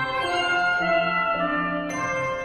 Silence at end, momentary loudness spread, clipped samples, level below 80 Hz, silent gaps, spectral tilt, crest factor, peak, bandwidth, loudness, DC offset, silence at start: 0 s; 5 LU; under 0.1%; -52 dBFS; none; -4 dB/octave; 14 dB; -10 dBFS; 12.5 kHz; -23 LUFS; under 0.1%; 0 s